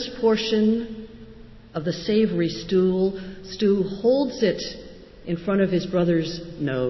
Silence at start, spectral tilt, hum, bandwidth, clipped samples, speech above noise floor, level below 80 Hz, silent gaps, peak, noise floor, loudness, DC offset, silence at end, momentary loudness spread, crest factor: 0 s; -6.5 dB/octave; none; 6.2 kHz; under 0.1%; 22 dB; -50 dBFS; none; -8 dBFS; -44 dBFS; -23 LUFS; under 0.1%; 0 s; 15 LU; 14 dB